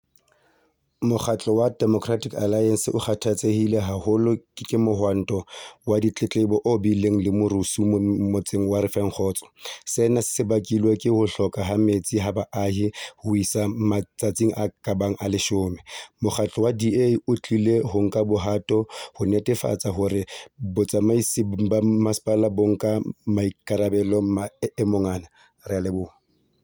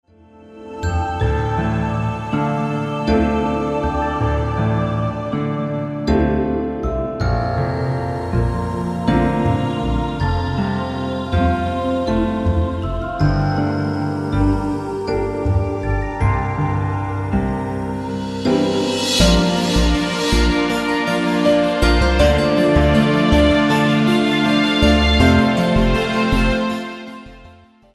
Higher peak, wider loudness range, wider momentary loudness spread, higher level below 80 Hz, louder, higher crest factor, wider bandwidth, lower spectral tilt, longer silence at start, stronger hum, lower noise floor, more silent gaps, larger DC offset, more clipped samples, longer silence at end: second, -8 dBFS vs -2 dBFS; second, 2 LU vs 6 LU; about the same, 7 LU vs 9 LU; second, -56 dBFS vs -26 dBFS; second, -23 LUFS vs -18 LUFS; about the same, 14 dB vs 16 dB; first, over 20 kHz vs 13.5 kHz; about the same, -6 dB/octave vs -6 dB/octave; first, 1 s vs 0.45 s; neither; first, -66 dBFS vs -45 dBFS; neither; neither; neither; about the same, 0.55 s vs 0.45 s